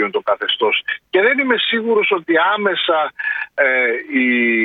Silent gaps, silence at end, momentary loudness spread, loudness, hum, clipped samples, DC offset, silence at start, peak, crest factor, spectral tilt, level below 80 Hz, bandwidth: none; 0 s; 5 LU; -16 LUFS; none; under 0.1%; under 0.1%; 0 s; -2 dBFS; 16 dB; -6.5 dB/octave; -70 dBFS; 4.8 kHz